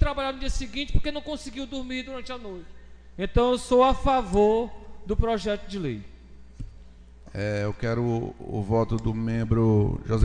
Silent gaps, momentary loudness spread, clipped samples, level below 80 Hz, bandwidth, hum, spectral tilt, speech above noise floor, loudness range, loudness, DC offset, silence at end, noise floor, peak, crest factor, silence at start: none; 17 LU; under 0.1%; -34 dBFS; 10 kHz; none; -7 dB/octave; 23 dB; 7 LU; -26 LUFS; 0.1%; 0 s; -47 dBFS; -6 dBFS; 18 dB; 0 s